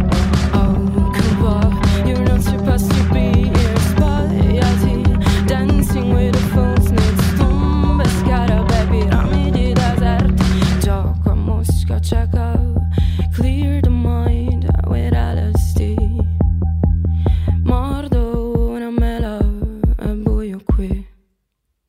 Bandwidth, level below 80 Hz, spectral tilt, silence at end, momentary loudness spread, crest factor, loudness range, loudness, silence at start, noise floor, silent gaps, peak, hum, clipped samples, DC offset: 15.5 kHz; -18 dBFS; -7 dB/octave; 0.8 s; 5 LU; 12 dB; 3 LU; -16 LUFS; 0 s; -71 dBFS; none; -2 dBFS; none; under 0.1%; under 0.1%